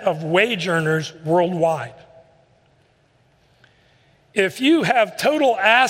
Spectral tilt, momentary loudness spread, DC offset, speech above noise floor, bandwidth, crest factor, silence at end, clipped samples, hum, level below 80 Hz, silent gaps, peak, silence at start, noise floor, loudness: -5 dB/octave; 7 LU; under 0.1%; 41 dB; 16 kHz; 20 dB; 0 s; under 0.1%; none; -66 dBFS; none; -2 dBFS; 0 s; -59 dBFS; -19 LUFS